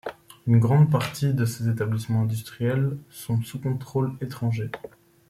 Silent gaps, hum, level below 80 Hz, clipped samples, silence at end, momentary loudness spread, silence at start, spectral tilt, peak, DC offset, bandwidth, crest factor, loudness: none; none; -58 dBFS; under 0.1%; 0.4 s; 12 LU; 0.05 s; -7.5 dB/octave; -8 dBFS; under 0.1%; 15.5 kHz; 16 dB; -25 LUFS